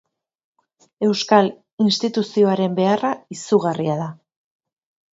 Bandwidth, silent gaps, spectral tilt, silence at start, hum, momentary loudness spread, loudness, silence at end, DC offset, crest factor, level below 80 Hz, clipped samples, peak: 7.8 kHz; 1.73-1.78 s; -5.5 dB/octave; 1 s; none; 8 LU; -19 LUFS; 1 s; under 0.1%; 20 dB; -68 dBFS; under 0.1%; 0 dBFS